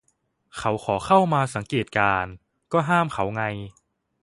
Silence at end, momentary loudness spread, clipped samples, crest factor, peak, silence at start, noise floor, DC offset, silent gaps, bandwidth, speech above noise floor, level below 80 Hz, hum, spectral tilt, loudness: 0.5 s; 14 LU; under 0.1%; 20 dB; -4 dBFS; 0.55 s; -70 dBFS; under 0.1%; none; 11.5 kHz; 47 dB; -52 dBFS; none; -6 dB/octave; -23 LUFS